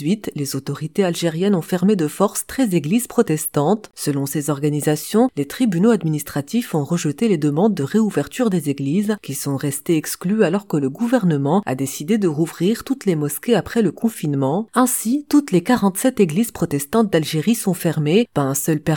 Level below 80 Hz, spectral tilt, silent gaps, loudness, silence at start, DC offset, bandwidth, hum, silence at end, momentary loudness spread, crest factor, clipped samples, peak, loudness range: -56 dBFS; -5.5 dB/octave; none; -19 LUFS; 0 s; 0.1%; 19 kHz; none; 0 s; 5 LU; 18 dB; under 0.1%; -2 dBFS; 2 LU